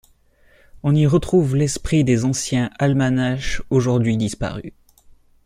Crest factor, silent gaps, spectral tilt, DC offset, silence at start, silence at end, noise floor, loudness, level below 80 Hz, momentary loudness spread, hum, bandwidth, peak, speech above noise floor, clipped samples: 16 dB; none; -6 dB/octave; under 0.1%; 0.75 s; 0.75 s; -55 dBFS; -19 LUFS; -38 dBFS; 9 LU; none; 14 kHz; -4 dBFS; 37 dB; under 0.1%